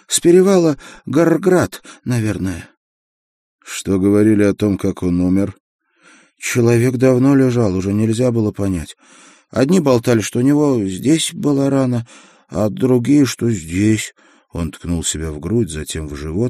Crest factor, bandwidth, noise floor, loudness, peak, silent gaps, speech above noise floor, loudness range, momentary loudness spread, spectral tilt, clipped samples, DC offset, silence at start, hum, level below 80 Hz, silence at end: 16 dB; 15.5 kHz; -50 dBFS; -16 LUFS; 0 dBFS; 2.77-3.59 s, 5.60-5.79 s; 35 dB; 3 LU; 13 LU; -6 dB/octave; under 0.1%; under 0.1%; 0.1 s; none; -42 dBFS; 0 s